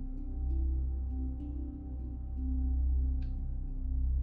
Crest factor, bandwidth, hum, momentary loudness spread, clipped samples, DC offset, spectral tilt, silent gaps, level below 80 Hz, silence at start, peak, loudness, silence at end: 10 dB; 1 kHz; none; 9 LU; under 0.1%; under 0.1%; -13 dB/octave; none; -34 dBFS; 0 s; -24 dBFS; -37 LUFS; 0 s